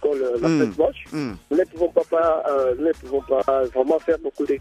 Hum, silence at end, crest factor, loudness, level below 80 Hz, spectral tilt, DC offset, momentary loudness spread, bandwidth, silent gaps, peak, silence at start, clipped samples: none; 0 s; 16 dB; -22 LUFS; -50 dBFS; -7 dB/octave; under 0.1%; 5 LU; 11.5 kHz; none; -4 dBFS; 0 s; under 0.1%